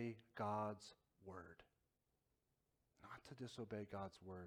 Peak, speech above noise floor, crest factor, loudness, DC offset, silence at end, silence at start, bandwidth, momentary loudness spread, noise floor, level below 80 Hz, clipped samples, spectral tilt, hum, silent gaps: -34 dBFS; 37 dB; 20 dB; -51 LUFS; under 0.1%; 0 s; 0 s; 16.5 kHz; 19 LU; -87 dBFS; -82 dBFS; under 0.1%; -6.5 dB/octave; none; none